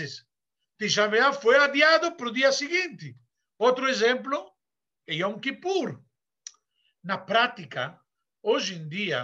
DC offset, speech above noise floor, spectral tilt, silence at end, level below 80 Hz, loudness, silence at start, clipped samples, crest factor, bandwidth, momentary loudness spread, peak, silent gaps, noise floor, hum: under 0.1%; over 65 dB; -3 dB/octave; 0 s; -78 dBFS; -24 LUFS; 0 s; under 0.1%; 20 dB; 8.2 kHz; 14 LU; -8 dBFS; none; under -90 dBFS; none